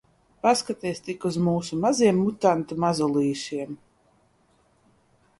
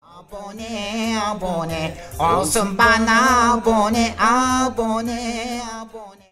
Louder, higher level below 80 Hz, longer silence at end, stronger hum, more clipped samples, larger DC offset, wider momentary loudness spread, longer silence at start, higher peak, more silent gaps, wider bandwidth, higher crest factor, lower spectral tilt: second, -24 LUFS vs -18 LUFS; second, -62 dBFS vs -40 dBFS; first, 1.65 s vs 0.2 s; neither; neither; neither; second, 11 LU vs 17 LU; first, 0.45 s vs 0.15 s; second, -6 dBFS vs -2 dBFS; neither; second, 11.5 kHz vs 16 kHz; about the same, 20 dB vs 18 dB; first, -5.5 dB/octave vs -3.5 dB/octave